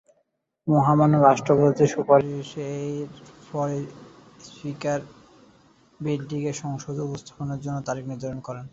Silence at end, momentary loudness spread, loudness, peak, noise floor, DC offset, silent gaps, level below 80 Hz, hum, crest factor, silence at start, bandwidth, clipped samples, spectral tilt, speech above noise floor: 0.05 s; 16 LU; -24 LUFS; -4 dBFS; -72 dBFS; under 0.1%; none; -60 dBFS; none; 20 dB; 0.65 s; 7.8 kHz; under 0.1%; -7.5 dB/octave; 48 dB